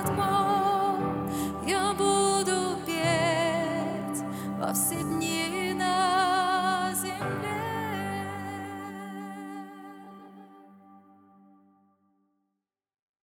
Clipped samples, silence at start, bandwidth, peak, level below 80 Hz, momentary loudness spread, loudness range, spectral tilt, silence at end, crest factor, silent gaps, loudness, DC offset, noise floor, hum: under 0.1%; 0 s; 18.5 kHz; -12 dBFS; -60 dBFS; 15 LU; 16 LU; -4 dB/octave; 2.3 s; 16 dB; none; -28 LUFS; under 0.1%; -83 dBFS; none